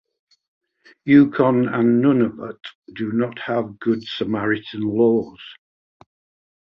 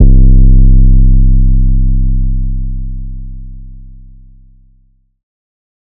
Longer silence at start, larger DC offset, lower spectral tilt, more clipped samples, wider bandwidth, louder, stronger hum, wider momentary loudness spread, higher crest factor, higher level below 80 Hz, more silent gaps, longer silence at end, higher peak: first, 1.05 s vs 0 s; neither; second, -9 dB/octave vs -21.5 dB/octave; neither; first, 5.8 kHz vs 0.7 kHz; second, -19 LUFS vs -12 LUFS; neither; about the same, 19 LU vs 21 LU; first, 18 dB vs 8 dB; second, -60 dBFS vs -8 dBFS; first, 2.75-2.82 s vs none; second, 1.1 s vs 2.1 s; about the same, -2 dBFS vs 0 dBFS